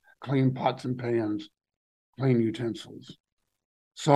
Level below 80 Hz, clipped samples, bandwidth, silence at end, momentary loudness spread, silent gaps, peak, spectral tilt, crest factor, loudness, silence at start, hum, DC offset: -70 dBFS; under 0.1%; 11 kHz; 0 s; 16 LU; 1.76-2.13 s, 3.20-3.24 s, 3.32-3.37 s, 3.65-3.91 s; -6 dBFS; -7 dB/octave; 22 dB; -29 LUFS; 0.2 s; none; under 0.1%